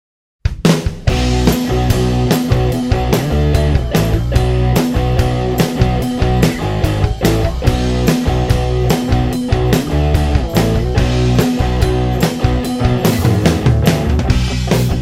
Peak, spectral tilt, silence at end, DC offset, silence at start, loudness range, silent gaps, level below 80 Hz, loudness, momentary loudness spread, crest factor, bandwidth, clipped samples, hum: 0 dBFS; -6.5 dB/octave; 0 s; under 0.1%; 0.45 s; 1 LU; none; -20 dBFS; -15 LUFS; 3 LU; 14 dB; 16.5 kHz; under 0.1%; none